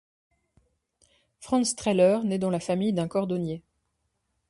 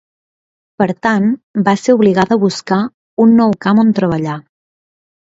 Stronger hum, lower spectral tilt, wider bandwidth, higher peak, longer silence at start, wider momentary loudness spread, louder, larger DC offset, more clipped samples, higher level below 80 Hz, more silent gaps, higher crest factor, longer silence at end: neither; second, -5.5 dB/octave vs -7 dB/octave; first, 11.5 kHz vs 7.8 kHz; second, -10 dBFS vs 0 dBFS; first, 1.4 s vs 0.8 s; about the same, 9 LU vs 8 LU; second, -26 LUFS vs -13 LUFS; neither; neither; second, -62 dBFS vs -54 dBFS; second, none vs 1.43-1.54 s, 2.94-3.17 s; about the same, 18 dB vs 14 dB; about the same, 0.9 s vs 0.8 s